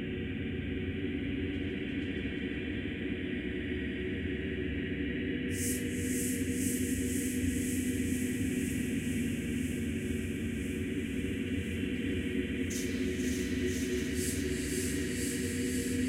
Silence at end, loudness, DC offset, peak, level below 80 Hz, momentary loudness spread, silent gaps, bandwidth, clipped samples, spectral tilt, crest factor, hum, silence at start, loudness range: 0 s; -34 LUFS; under 0.1%; -18 dBFS; -46 dBFS; 4 LU; none; 16 kHz; under 0.1%; -5 dB/octave; 16 dB; none; 0 s; 3 LU